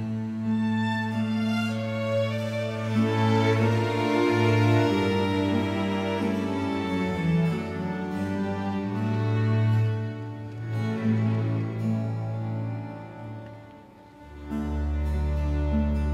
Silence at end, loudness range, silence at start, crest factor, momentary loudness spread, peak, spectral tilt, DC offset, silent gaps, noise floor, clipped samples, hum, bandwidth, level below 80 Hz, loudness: 0 s; 8 LU; 0 s; 16 dB; 11 LU; -10 dBFS; -7.5 dB/octave; under 0.1%; none; -48 dBFS; under 0.1%; none; 11 kHz; -38 dBFS; -26 LUFS